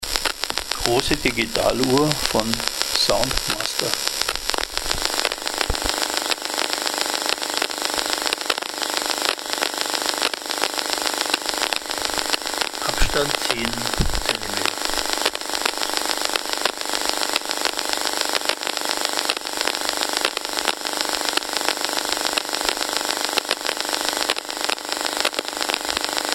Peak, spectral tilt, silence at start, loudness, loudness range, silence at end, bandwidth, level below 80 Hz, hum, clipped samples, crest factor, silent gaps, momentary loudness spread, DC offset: 0 dBFS; -1.5 dB/octave; 0 s; -21 LUFS; 2 LU; 0 s; 17.5 kHz; -38 dBFS; none; under 0.1%; 24 dB; none; 3 LU; under 0.1%